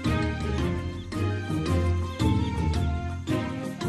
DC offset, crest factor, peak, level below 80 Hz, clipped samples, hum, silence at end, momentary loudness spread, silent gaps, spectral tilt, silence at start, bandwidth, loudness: under 0.1%; 14 dB; -14 dBFS; -36 dBFS; under 0.1%; none; 0 s; 6 LU; none; -7 dB/octave; 0 s; 12.5 kHz; -28 LUFS